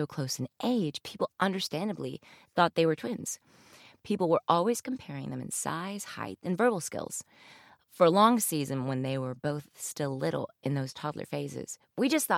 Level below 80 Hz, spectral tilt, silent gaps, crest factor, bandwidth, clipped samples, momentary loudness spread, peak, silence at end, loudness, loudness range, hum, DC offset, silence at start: -72 dBFS; -4.5 dB/octave; none; 22 dB; 16.5 kHz; under 0.1%; 13 LU; -8 dBFS; 0 s; -31 LUFS; 5 LU; none; under 0.1%; 0 s